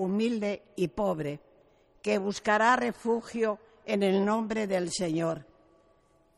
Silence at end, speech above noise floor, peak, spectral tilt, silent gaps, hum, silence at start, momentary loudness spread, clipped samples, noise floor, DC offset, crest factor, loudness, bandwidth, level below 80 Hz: 0.95 s; 36 dB; -12 dBFS; -5 dB/octave; none; none; 0 s; 10 LU; under 0.1%; -65 dBFS; under 0.1%; 18 dB; -29 LUFS; 12.5 kHz; -62 dBFS